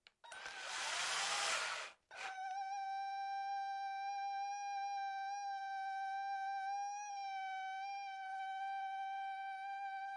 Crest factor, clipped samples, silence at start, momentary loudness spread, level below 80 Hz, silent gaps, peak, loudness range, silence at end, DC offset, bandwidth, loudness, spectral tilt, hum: 16 dB; under 0.1%; 0.25 s; 8 LU; under -90 dBFS; none; -26 dBFS; 3 LU; 0 s; under 0.1%; 11.5 kHz; -43 LUFS; 2.5 dB/octave; none